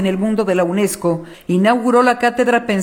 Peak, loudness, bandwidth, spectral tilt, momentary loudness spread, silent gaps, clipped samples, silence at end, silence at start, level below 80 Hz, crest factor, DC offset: -2 dBFS; -16 LUFS; 19 kHz; -5.5 dB/octave; 7 LU; none; under 0.1%; 0 s; 0 s; -52 dBFS; 14 dB; under 0.1%